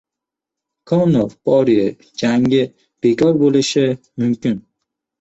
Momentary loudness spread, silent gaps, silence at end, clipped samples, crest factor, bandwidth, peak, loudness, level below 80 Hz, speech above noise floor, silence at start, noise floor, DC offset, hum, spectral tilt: 8 LU; none; 0.6 s; under 0.1%; 14 dB; 8.2 kHz; -2 dBFS; -16 LUFS; -54 dBFS; 69 dB; 0.9 s; -84 dBFS; under 0.1%; none; -6.5 dB/octave